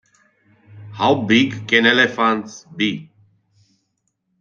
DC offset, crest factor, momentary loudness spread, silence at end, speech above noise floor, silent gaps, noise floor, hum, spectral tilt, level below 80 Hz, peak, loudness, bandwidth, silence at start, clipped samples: under 0.1%; 20 dB; 16 LU; 1.35 s; 54 dB; none; -71 dBFS; none; -4.5 dB/octave; -62 dBFS; -2 dBFS; -17 LUFS; 7.4 kHz; 0.75 s; under 0.1%